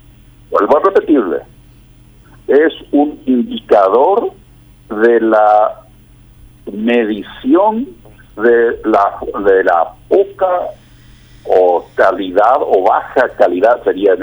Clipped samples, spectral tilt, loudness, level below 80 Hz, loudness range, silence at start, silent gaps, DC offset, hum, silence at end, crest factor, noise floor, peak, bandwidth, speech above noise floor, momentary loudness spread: under 0.1%; -6.5 dB/octave; -12 LUFS; -46 dBFS; 2 LU; 0.5 s; none; under 0.1%; none; 0 s; 12 dB; -42 dBFS; 0 dBFS; over 20 kHz; 30 dB; 10 LU